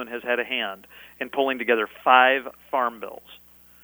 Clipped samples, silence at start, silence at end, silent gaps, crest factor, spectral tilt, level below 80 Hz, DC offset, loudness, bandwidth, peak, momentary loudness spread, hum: under 0.1%; 0 s; 0.5 s; none; 24 dB; -4 dB/octave; -66 dBFS; under 0.1%; -22 LUFS; over 20 kHz; -2 dBFS; 22 LU; 60 Hz at -65 dBFS